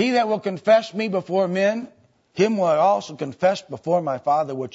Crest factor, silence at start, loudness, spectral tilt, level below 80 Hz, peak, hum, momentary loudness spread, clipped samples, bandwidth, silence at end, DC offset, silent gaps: 16 dB; 0 s; -21 LUFS; -6 dB/octave; -70 dBFS; -6 dBFS; none; 9 LU; under 0.1%; 8 kHz; 0.05 s; under 0.1%; none